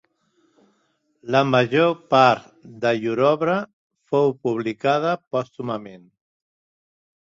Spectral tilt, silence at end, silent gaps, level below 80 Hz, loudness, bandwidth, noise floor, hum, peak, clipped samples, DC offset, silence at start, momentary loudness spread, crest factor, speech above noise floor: -6.5 dB/octave; 1.25 s; 3.73-3.90 s, 5.27-5.31 s; -66 dBFS; -21 LUFS; 7.6 kHz; -68 dBFS; none; -2 dBFS; under 0.1%; under 0.1%; 1.25 s; 13 LU; 22 dB; 48 dB